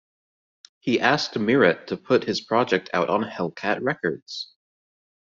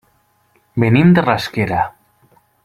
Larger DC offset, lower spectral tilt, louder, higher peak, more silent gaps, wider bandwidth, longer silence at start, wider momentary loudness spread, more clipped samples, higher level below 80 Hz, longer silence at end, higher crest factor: neither; second, -3 dB/octave vs -7.5 dB/octave; second, -23 LUFS vs -15 LUFS; about the same, -2 dBFS vs -2 dBFS; first, 4.22-4.26 s vs none; second, 7.6 kHz vs 13.5 kHz; about the same, 0.85 s vs 0.75 s; about the same, 13 LU vs 12 LU; neither; second, -66 dBFS vs -48 dBFS; about the same, 0.8 s vs 0.75 s; first, 22 dB vs 16 dB